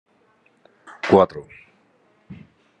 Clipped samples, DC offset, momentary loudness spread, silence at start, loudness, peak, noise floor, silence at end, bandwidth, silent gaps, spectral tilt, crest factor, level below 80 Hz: under 0.1%; under 0.1%; 28 LU; 1.05 s; -18 LUFS; 0 dBFS; -61 dBFS; 0.45 s; 8.8 kHz; none; -7.5 dB/octave; 24 dB; -64 dBFS